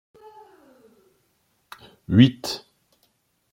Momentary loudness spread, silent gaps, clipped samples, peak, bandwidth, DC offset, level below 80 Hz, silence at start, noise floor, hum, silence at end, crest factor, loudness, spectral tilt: 29 LU; none; under 0.1%; -2 dBFS; 16 kHz; under 0.1%; -60 dBFS; 2.1 s; -68 dBFS; none; 0.95 s; 24 dB; -20 LUFS; -6.5 dB/octave